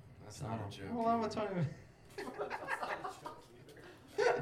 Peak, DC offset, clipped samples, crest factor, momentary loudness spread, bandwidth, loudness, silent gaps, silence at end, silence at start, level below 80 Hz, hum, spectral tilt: -20 dBFS; under 0.1%; under 0.1%; 20 dB; 21 LU; 15.5 kHz; -39 LUFS; none; 0 s; 0 s; -70 dBFS; none; -6 dB/octave